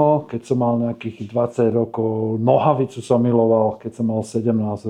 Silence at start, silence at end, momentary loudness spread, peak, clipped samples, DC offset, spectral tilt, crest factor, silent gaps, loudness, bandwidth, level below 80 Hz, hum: 0 s; 0 s; 7 LU; -2 dBFS; under 0.1%; under 0.1%; -8.5 dB/octave; 18 dB; none; -20 LUFS; 10.5 kHz; -64 dBFS; none